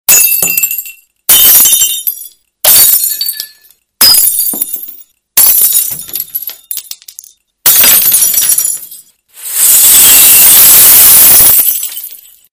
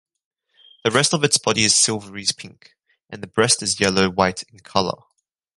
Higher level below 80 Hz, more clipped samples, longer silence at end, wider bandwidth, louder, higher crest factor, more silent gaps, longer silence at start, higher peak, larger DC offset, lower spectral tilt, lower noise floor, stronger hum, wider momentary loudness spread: first, -42 dBFS vs -52 dBFS; first, 6% vs under 0.1%; second, 0.35 s vs 0.65 s; first, over 20 kHz vs 11.5 kHz; first, -3 LUFS vs -18 LUFS; second, 8 dB vs 20 dB; neither; second, 0.1 s vs 0.85 s; about the same, 0 dBFS vs -2 dBFS; neither; second, 1.5 dB/octave vs -2.5 dB/octave; second, -44 dBFS vs -54 dBFS; neither; about the same, 19 LU vs 18 LU